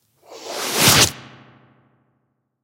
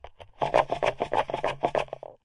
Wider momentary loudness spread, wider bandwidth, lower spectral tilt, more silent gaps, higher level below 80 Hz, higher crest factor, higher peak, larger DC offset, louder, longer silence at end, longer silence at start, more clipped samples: first, 20 LU vs 7 LU; first, 16 kHz vs 11.5 kHz; second, -1.5 dB/octave vs -5 dB/octave; neither; about the same, -48 dBFS vs -52 dBFS; about the same, 22 dB vs 22 dB; first, 0 dBFS vs -6 dBFS; neither; first, -15 LUFS vs -28 LUFS; first, 1.4 s vs 0.1 s; first, 0.3 s vs 0.05 s; neither